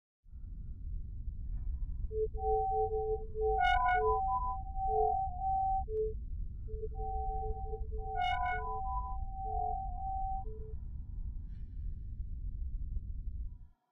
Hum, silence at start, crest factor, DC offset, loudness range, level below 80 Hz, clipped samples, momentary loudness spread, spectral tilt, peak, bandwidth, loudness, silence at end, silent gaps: none; 0.25 s; 16 dB; under 0.1%; 10 LU; -40 dBFS; under 0.1%; 14 LU; -3.5 dB/octave; -20 dBFS; 5.4 kHz; -37 LUFS; 0.25 s; none